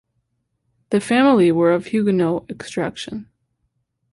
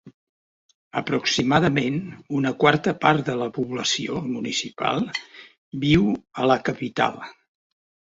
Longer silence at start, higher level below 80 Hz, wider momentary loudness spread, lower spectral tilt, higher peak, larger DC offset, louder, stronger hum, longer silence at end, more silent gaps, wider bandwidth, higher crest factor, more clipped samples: first, 0.9 s vs 0.05 s; second, -58 dBFS vs -52 dBFS; first, 16 LU vs 10 LU; first, -6.5 dB/octave vs -5 dB/octave; about the same, -4 dBFS vs -2 dBFS; neither; first, -18 LUFS vs -23 LUFS; neither; about the same, 0.9 s vs 0.85 s; second, none vs 0.14-0.91 s, 5.58-5.72 s; first, 11.5 kHz vs 8 kHz; second, 16 dB vs 22 dB; neither